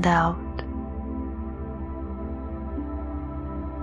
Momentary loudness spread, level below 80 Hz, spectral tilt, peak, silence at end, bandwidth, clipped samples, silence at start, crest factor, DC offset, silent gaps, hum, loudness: 9 LU; -34 dBFS; -7 dB/octave; -6 dBFS; 0 s; 9.4 kHz; under 0.1%; 0 s; 22 dB; under 0.1%; none; none; -31 LUFS